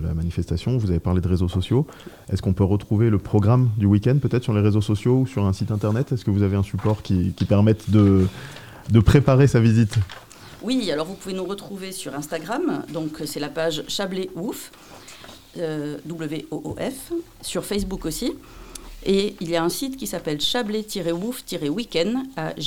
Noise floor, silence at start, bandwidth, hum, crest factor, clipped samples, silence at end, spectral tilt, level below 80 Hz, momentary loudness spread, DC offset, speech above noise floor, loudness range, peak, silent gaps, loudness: -43 dBFS; 0 s; 16.5 kHz; none; 20 dB; under 0.1%; 0 s; -6.5 dB/octave; -42 dBFS; 14 LU; 0.2%; 22 dB; 10 LU; -2 dBFS; none; -22 LUFS